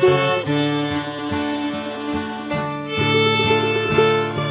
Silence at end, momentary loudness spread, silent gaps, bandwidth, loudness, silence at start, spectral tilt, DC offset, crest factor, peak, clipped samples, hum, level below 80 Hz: 0 s; 9 LU; none; 4 kHz; -20 LUFS; 0 s; -10 dB/octave; under 0.1%; 16 dB; -4 dBFS; under 0.1%; none; -46 dBFS